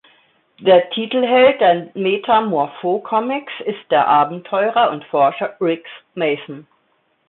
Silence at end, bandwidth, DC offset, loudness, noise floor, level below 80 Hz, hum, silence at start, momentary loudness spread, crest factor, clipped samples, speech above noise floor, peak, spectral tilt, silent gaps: 0.7 s; 4.2 kHz; under 0.1%; -17 LUFS; -63 dBFS; -64 dBFS; none; 0.6 s; 13 LU; 16 dB; under 0.1%; 47 dB; -2 dBFS; -10 dB/octave; none